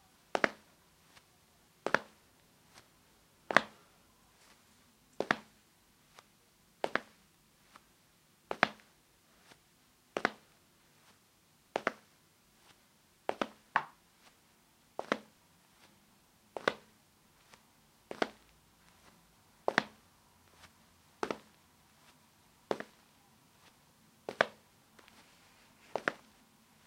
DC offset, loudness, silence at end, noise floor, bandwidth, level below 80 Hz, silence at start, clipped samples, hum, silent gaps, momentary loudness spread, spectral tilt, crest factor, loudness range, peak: under 0.1%; -37 LUFS; 0.7 s; -68 dBFS; 16 kHz; -78 dBFS; 0.35 s; under 0.1%; none; none; 27 LU; -3.5 dB/octave; 40 dB; 7 LU; -2 dBFS